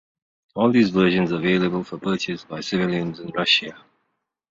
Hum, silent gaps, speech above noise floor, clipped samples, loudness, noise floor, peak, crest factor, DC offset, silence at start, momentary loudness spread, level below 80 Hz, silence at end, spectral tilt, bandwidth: none; none; 54 dB; under 0.1%; -21 LUFS; -75 dBFS; -4 dBFS; 20 dB; under 0.1%; 0.55 s; 10 LU; -58 dBFS; 0.75 s; -5.5 dB/octave; 7.6 kHz